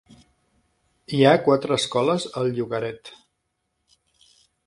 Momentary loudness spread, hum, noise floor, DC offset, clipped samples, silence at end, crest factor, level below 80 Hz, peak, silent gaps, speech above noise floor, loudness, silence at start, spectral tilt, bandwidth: 12 LU; none; -76 dBFS; under 0.1%; under 0.1%; 1.5 s; 22 dB; -64 dBFS; -2 dBFS; none; 55 dB; -22 LUFS; 1.1 s; -5.5 dB/octave; 11.5 kHz